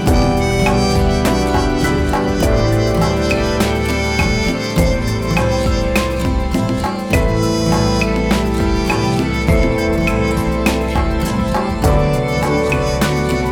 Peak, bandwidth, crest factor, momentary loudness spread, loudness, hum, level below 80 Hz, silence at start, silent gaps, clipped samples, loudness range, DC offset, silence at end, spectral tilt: 0 dBFS; 19 kHz; 14 dB; 3 LU; -16 LUFS; none; -22 dBFS; 0 s; none; under 0.1%; 1 LU; under 0.1%; 0 s; -6 dB/octave